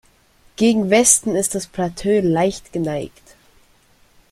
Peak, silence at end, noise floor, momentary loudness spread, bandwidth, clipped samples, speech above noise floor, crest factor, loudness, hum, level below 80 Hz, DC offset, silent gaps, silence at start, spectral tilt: 0 dBFS; 1.25 s; -55 dBFS; 12 LU; 15.5 kHz; under 0.1%; 37 dB; 20 dB; -17 LUFS; none; -50 dBFS; under 0.1%; none; 0.6 s; -4 dB/octave